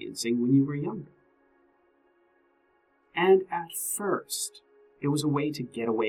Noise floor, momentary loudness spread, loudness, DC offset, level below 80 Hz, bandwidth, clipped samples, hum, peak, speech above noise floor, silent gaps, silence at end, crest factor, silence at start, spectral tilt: -68 dBFS; 12 LU; -28 LUFS; under 0.1%; -72 dBFS; 17 kHz; under 0.1%; none; -10 dBFS; 41 dB; none; 0 s; 20 dB; 0 s; -5 dB/octave